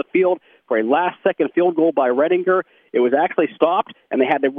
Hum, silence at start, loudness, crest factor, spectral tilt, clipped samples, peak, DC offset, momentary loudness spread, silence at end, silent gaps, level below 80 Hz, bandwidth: none; 0.15 s; -19 LUFS; 16 dB; -8.5 dB/octave; under 0.1%; -2 dBFS; under 0.1%; 5 LU; 0 s; none; -72 dBFS; 3.7 kHz